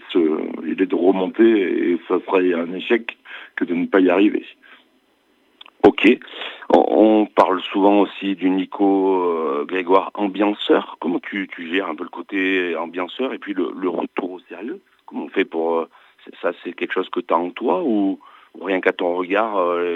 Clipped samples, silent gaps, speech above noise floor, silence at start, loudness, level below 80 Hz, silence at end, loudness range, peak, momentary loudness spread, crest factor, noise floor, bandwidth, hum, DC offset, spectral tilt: under 0.1%; none; 42 dB; 0.05 s; -19 LUFS; -64 dBFS; 0 s; 8 LU; -2 dBFS; 13 LU; 18 dB; -61 dBFS; 5.8 kHz; none; under 0.1%; -7 dB/octave